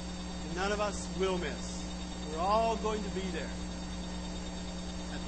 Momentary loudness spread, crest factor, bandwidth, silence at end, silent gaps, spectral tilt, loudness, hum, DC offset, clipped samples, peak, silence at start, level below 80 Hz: 10 LU; 18 dB; 8.8 kHz; 0 s; none; -4.5 dB/octave; -35 LUFS; none; under 0.1%; under 0.1%; -16 dBFS; 0 s; -44 dBFS